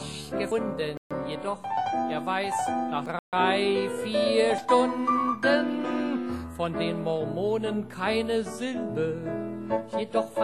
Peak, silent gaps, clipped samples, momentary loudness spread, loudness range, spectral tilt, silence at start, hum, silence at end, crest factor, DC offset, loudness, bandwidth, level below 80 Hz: -8 dBFS; 0.97-1.10 s, 3.19-3.32 s; under 0.1%; 9 LU; 4 LU; -5 dB/octave; 0 s; none; 0 s; 18 dB; 0.1%; -28 LUFS; 13 kHz; -58 dBFS